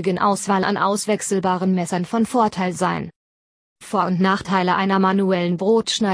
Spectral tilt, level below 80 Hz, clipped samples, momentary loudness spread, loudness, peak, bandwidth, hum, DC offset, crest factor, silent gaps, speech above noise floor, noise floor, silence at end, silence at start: -5 dB/octave; -58 dBFS; under 0.1%; 5 LU; -20 LUFS; -4 dBFS; 11 kHz; none; under 0.1%; 16 dB; 3.16-3.76 s; over 71 dB; under -90 dBFS; 0 s; 0 s